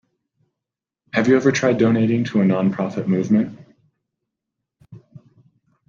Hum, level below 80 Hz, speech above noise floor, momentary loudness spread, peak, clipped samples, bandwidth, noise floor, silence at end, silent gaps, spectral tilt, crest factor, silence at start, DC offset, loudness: none; -62 dBFS; 69 dB; 7 LU; -2 dBFS; under 0.1%; 7.4 kHz; -86 dBFS; 0.9 s; none; -7 dB/octave; 18 dB; 1.15 s; under 0.1%; -19 LUFS